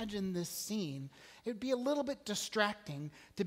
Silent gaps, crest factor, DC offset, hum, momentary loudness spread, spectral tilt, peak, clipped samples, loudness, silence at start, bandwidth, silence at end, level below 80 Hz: none; 22 dB; under 0.1%; none; 12 LU; -4 dB/octave; -16 dBFS; under 0.1%; -38 LUFS; 0 s; 16 kHz; 0 s; -70 dBFS